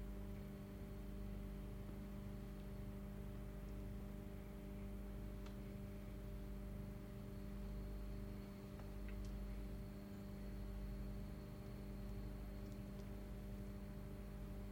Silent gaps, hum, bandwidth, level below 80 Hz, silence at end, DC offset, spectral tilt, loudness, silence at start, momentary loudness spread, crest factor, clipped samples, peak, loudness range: none; 50 Hz at -60 dBFS; 16.5 kHz; -52 dBFS; 0 s; under 0.1%; -7.5 dB/octave; -53 LUFS; 0 s; 2 LU; 12 dB; under 0.1%; -38 dBFS; 1 LU